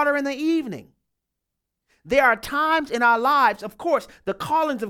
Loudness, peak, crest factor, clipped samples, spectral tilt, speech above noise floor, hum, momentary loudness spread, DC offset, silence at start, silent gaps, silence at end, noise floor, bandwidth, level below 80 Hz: -21 LUFS; -6 dBFS; 18 dB; under 0.1%; -4.5 dB/octave; 61 dB; none; 12 LU; under 0.1%; 0 s; none; 0 s; -82 dBFS; 17 kHz; -56 dBFS